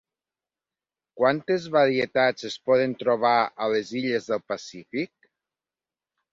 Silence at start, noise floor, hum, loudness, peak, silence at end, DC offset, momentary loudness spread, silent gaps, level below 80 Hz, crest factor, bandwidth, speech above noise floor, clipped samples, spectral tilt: 1.15 s; under -90 dBFS; none; -24 LUFS; -8 dBFS; 1.25 s; under 0.1%; 11 LU; none; -70 dBFS; 18 dB; 7.6 kHz; over 66 dB; under 0.1%; -5 dB/octave